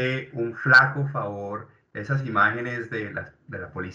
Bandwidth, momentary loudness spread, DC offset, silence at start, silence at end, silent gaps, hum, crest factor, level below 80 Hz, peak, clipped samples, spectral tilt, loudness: 7.8 kHz; 21 LU; under 0.1%; 0 s; 0 s; none; none; 22 dB; -64 dBFS; -2 dBFS; under 0.1%; -6.5 dB/octave; -23 LUFS